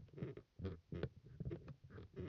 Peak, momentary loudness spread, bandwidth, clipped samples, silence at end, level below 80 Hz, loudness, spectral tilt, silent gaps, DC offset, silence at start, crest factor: -30 dBFS; 7 LU; 6.6 kHz; under 0.1%; 0 s; -64 dBFS; -52 LUFS; -8 dB/octave; none; under 0.1%; 0 s; 20 dB